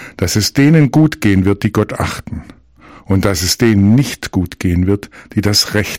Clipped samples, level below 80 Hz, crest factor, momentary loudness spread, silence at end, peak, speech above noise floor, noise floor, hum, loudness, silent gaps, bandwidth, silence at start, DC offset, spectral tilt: under 0.1%; -36 dBFS; 14 dB; 10 LU; 0 s; 0 dBFS; 28 dB; -41 dBFS; none; -13 LUFS; none; 16.5 kHz; 0 s; under 0.1%; -5 dB/octave